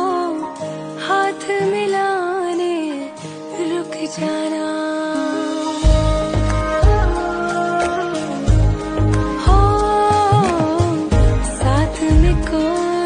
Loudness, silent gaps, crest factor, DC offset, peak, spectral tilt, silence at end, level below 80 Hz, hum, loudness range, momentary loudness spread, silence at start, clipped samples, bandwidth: -18 LUFS; none; 14 dB; under 0.1%; -2 dBFS; -6.5 dB/octave; 0 s; -22 dBFS; none; 6 LU; 9 LU; 0 s; under 0.1%; 10 kHz